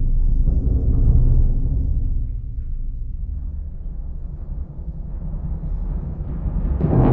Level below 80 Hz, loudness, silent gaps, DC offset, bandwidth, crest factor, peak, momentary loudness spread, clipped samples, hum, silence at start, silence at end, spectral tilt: -20 dBFS; -24 LUFS; none; under 0.1%; 2 kHz; 16 dB; -2 dBFS; 14 LU; under 0.1%; none; 0 s; 0 s; -12.5 dB/octave